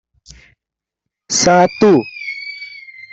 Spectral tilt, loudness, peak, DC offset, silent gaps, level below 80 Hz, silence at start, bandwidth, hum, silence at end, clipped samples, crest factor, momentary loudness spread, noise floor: -4 dB/octave; -14 LUFS; -2 dBFS; under 0.1%; none; -52 dBFS; 1.3 s; 8.4 kHz; none; 0.35 s; under 0.1%; 16 dB; 19 LU; -85 dBFS